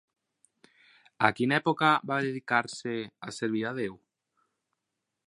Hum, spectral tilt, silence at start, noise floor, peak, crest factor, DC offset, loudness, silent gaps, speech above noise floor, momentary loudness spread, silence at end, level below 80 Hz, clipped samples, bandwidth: none; -5 dB/octave; 1.2 s; -85 dBFS; -4 dBFS; 28 dB; under 0.1%; -28 LUFS; none; 56 dB; 11 LU; 1.35 s; -74 dBFS; under 0.1%; 11.5 kHz